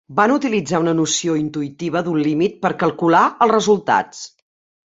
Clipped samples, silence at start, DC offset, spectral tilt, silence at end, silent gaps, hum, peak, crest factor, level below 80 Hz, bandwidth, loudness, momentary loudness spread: under 0.1%; 0.1 s; under 0.1%; -4.5 dB/octave; 0.7 s; none; none; -2 dBFS; 16 dB; -60 dBFS; 8 kHz; -17 LUFS; 10 LU